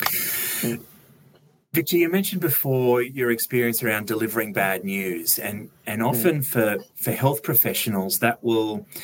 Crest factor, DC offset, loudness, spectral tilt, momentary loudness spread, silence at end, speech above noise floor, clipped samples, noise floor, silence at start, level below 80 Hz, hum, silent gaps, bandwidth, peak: 20 dB; under 0.1%; -22 LUFS; -4.5 dB/octave; 7 LU; 0 s; 34 dB; under 0.1%; -56 dBFS; 0 s; -68 dBFS; none; none; 17 kHz; -4 dBFS